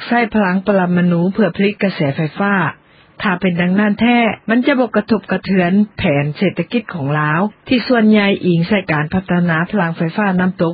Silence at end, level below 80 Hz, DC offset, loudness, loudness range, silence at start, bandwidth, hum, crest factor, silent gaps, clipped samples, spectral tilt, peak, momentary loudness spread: 0 s; -46 dBFS; under 0.1%; -15 LUFS; 1 LU; 0 s; 5 kHz; none; 14 dB; none; under 0.1%; -12.5 dB/octave; -2 dBFS; 5 LU